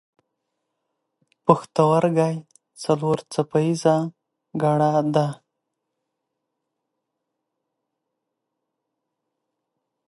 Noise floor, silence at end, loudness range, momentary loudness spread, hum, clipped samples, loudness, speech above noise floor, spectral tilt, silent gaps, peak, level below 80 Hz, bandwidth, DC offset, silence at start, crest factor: -81 dBFS; 4.75 s; 5 LU; 14 LU; none; under 0.1%; -21 LUFS; 60 dB; -7 dB/octave; none; 0 dBFS; -68 dBFS; 11.5 kHz; under 0.1%; 1.45 s; 24 dB